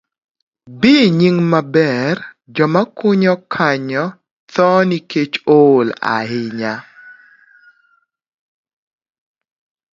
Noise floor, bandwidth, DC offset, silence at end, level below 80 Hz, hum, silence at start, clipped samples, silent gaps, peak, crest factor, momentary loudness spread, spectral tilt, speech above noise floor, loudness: -60 dBFS; 7.6 kHz; under 0.1%; 2.8 s; -60 dBFS; none; 0.65 s; under 0.1%; 4.31-4.47 s; 0 dBFS; 16 dB; 12 LU; -7 dB/octave; 46 dB; -15 LUFS